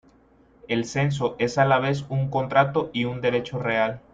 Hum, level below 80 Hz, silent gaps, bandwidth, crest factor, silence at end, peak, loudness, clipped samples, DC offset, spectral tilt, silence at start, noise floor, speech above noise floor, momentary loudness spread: none; -56 dBFS; none; 7.8 kHz; 20 dB; 0.15 s; -4 dBFS; -24 LUFS; under 0.1%; under 0.1%; -6 dB/octave; 0.65 s; -57 dBFS; 34 dB; 6 LU